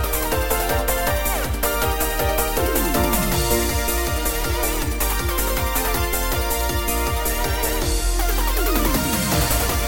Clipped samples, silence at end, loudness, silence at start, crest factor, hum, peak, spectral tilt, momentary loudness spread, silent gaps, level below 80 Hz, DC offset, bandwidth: under 0.1%; 0 s; -21 LUFS; 0 s; 14 dB; none; -6 dBFS; -3.5 dB/octave; 3 LU; none; -24 dBFS; under 0.1%; 17 kHz